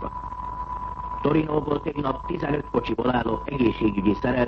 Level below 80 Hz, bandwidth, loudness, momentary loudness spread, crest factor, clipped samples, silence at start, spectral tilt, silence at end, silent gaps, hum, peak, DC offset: -40 dBFS; 6.2 kHz; -26 LUFS; 10 LU; 16 dB; under 0.1%; 0 s; -9 dB/octave; 0 s; none; none; -8 dBFS; under 0.1%